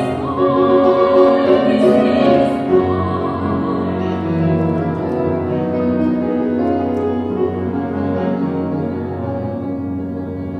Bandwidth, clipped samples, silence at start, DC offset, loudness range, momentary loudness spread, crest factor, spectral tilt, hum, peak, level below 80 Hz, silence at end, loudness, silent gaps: 9.6 kHz; under 0.1%; 0 s; under 0.1%; 7 LU; 10 LU; 16 dB; -9 dB/octave; none; 0 dBFS; -46 dBFS; 0 s; -17 LUFS; none